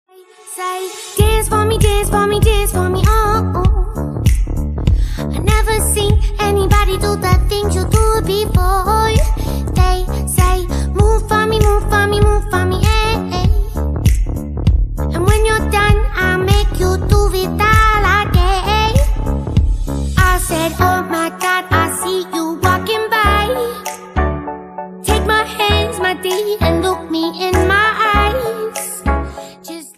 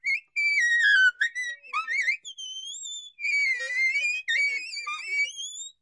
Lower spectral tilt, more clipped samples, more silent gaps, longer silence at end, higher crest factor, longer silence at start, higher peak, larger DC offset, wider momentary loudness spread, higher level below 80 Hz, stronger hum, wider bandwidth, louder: first, -5 dB/octave vs 5.5 dB/octave; neither; neither; about the same, 0.05 s vs 0.1 s; about the same, 14 dB vs 16 dB; first, 0.45 s vs 0.05 s; first, 0 dBFS vs -12 dBFS; neither; second, 7 LU vs 15 LU; first, -18 dBFS vs -86 dBFS; neither; first, 15.5 kHz vs 11.5 kHz; first, -15 LUFS vs -24 LUFS